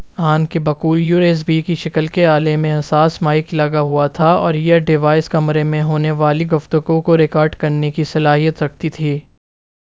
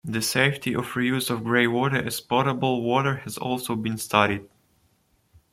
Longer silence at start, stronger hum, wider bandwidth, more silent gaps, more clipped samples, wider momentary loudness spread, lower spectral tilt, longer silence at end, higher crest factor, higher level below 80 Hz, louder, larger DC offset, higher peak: about the same, 0 s vs 0.05 s; neither; second, 7.6 kHz vs 16.5 kHz; neither; neither; about the same, 5 LU vs 7 LU; first, -8 dB/octave vs -4.5 dB/octave; second, 0.8 s vs 1.05 s; second, 14 dB vs 22 dB; first, -48 dBFS vs -60 dBFS; first, -15 LUFS vs -24 LUFS; first, 0.2% vs under 0.1%; about the same, 0 dBFS vs -2 dBFS